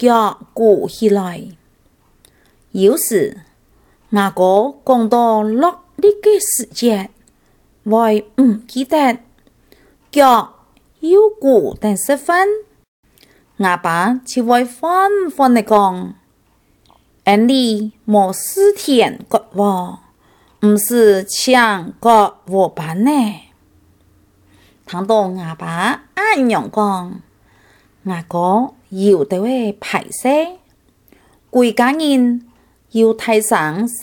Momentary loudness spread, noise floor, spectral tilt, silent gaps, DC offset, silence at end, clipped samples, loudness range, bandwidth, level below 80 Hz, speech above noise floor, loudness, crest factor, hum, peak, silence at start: 11 LU; -56 dBFS; -4.5 dB/octave; 12.88-13.03 s; under 0.1%; 0 s; under 0.1%; 4 LU; 19 kHz; -56 dBFS; 42 dB; -15 LUFS; 16 dB; none; 0 dBFS; 0 s